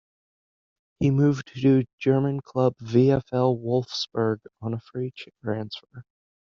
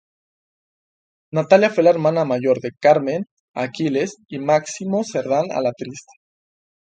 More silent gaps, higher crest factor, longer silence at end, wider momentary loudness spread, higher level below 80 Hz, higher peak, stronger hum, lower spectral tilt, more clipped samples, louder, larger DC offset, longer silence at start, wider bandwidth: second, 1.93-1.98 s vs 3.31-3.54 s; about the same, 18 dB vs 20 dB; second, 0.55 s vs 0.9 s; about the same, 12 LU vs 12 LU; first, -58 dBFS vs -66 dBFS; second, -8 dBFS vs 0 dBFS; neither; about the same, -7 dB/octave vs -6 dB/octave; neither; second, -25 LUFS vs -19 LUFS; neither; second, 1 s vs 1.35 s; second, 7.2 kHz vs 9.2 kHz